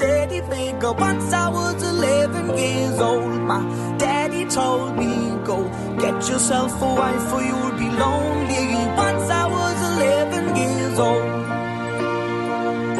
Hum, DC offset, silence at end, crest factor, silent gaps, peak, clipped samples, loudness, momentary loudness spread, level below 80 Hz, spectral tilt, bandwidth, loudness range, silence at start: none; under 0.1%; 0 s; 14 dB; none; -6 dBFS; under 0.1%; -21 LUFS; 5 LU; -44 dBFS; -4.5 dB/octave; 12.5 kHz; 1 LU; 0 s